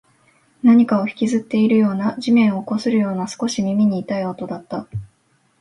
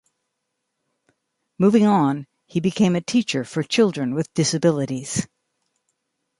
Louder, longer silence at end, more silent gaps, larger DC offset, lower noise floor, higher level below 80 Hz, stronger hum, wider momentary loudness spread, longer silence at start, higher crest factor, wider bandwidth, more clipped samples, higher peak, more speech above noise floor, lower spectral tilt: first, -18 LUFS vs -21 LUFS; second, 0.55 s vs 1.15 s; neither; neither; second, -62 dBFS vs -78 dBFS; about the same, -56 dBFS vs -60 dBFS; neither; first, 14 LU vs 10 LU; second, 0.65 s vs 1.6 s; about the same, 16 dB vs 16 dB; about the same, 11.5 kHz vs 11.5 kHz; neither; first, -2 dBFS vs -6 dBFS; second, 44 dB vs 58 dB; about the same, -6.5 dB/octave vs -5.5 dB/octave